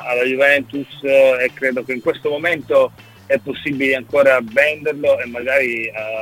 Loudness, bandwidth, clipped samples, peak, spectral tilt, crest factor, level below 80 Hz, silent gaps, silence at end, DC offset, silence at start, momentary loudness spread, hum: -17 LUFS; 16 kHz; under 0.1%; 0 dBFS; -5 dB/octave; 16 dB; -58 dBFS; none; 0 s; under 0.1%; 0 s; 8 LU; none